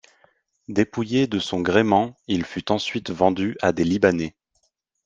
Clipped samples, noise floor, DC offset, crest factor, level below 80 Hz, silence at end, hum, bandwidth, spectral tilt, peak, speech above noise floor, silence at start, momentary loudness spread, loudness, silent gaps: under 0.1%; -70 dBFS; under 0.1%; 20 dB; -58 dBFS; 0.75 s; none; 9.2 kHz; -6 dB/octave; -2 dBFS; 49 dB; 0.7 s; 8 LU; -22 LUFS; none